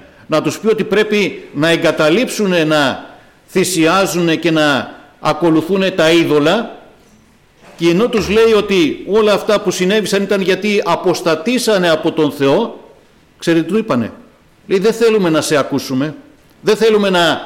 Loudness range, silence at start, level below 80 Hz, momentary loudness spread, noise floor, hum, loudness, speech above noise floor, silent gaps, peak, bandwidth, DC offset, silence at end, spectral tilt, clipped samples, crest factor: 3 LU; 0.3 s; -48 dBFS; 7 LU; -48 dBFS; none; -14 LUFS; 35 dB; none; -4 dBFS; 17 kHz; under 0.1%; 0 s; -4.5 dB/octave; under 0.1%; 10 dB